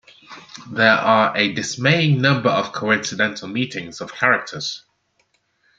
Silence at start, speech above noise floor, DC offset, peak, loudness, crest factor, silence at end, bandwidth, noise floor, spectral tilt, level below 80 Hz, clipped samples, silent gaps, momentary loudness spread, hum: 0.3 s; 46 dB; under 0.1%; -2 dBFS; -18 LUFS; 20 dB; 1 s; 9 kHz; -66 dBFS; -4.5 dB/octave; -64 dBFS; under 0.1%; none; 15 LU; none